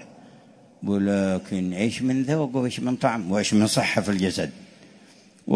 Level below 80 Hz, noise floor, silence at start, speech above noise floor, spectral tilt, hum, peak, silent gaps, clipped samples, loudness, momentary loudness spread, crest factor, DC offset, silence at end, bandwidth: -60 dBFS; -52 dBFS; 0 s; 29 dB; -5 dB/octave; none; -6 dBFS; none; under 0.1%; -24 LUFS; 8 LU; 20 dB; under 0.1%; 0 s; 11 kHz